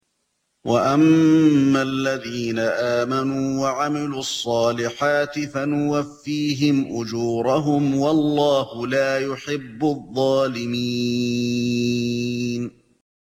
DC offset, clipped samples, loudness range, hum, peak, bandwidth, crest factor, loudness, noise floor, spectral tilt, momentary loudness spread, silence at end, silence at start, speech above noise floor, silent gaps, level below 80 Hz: under 0.1%; under 0.1%; 4 LU; none; -6 dBFS; 15.5 kHz; 14 dB; -21 LUFS; -72 dBFS; -5.5 dB/octave; 9 LU; 0.7 s; 0.65 s; 52 dB; none; -60 dBFS